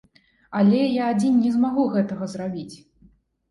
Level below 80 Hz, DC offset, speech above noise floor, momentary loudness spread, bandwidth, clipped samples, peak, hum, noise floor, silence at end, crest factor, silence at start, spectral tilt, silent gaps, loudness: -62 dBFS; under 0.1%; 36 dB; 12 LU; 11.5 kHz; under 0.1%; -8 dBFS; none; -57 dBFS; 0.75 s; 14 dB; 0.5 s; -7.5 dB/octave; none; -22 LUFS